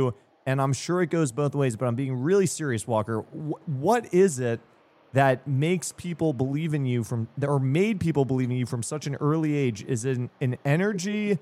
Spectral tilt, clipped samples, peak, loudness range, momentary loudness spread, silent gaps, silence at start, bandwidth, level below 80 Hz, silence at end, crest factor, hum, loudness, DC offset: -6.5 dB/octave; under 0.1%; -8 dBFS; 1 LU; 7 LU; none; 0 s; 14.5 kHz; -64 dBFS; 0.05 s; 18 dB; none; -26 LUFS; under 0.1%